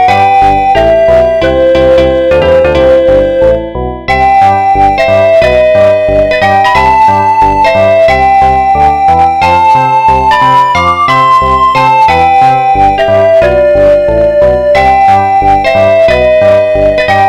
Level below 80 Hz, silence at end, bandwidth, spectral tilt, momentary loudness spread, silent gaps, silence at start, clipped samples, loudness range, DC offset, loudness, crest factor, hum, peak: -24 dBFS; 0 s; 12 kHz; -6 dB/octave; 2 LU; none; 0 s; 0.5%; 1 LU; 0.2%; -6 LUFS; 6 dB; none; 0 dBFS